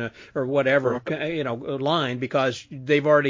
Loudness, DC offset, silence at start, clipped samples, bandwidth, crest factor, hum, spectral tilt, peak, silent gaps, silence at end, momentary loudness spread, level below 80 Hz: -24 LUFS; under 0.1%; 0 s; under 0.1%; 7.6 kHz; 18 dB; none; -6 dB/octave; -6 dBFS; none; 0 s; 8 LU; -64 dBFS